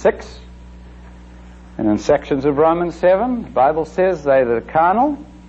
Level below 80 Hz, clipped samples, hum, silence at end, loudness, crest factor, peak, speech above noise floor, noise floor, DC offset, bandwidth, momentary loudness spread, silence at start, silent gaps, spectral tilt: -40 dBFS; under 0.1%; none; 0 s; -17 LUFS; 14 dB; -4 dBFS; 23 dB; -39 dBFS; under 0.1%; 8 kHz; 5 LU; 0 s; none; -7 dB/octave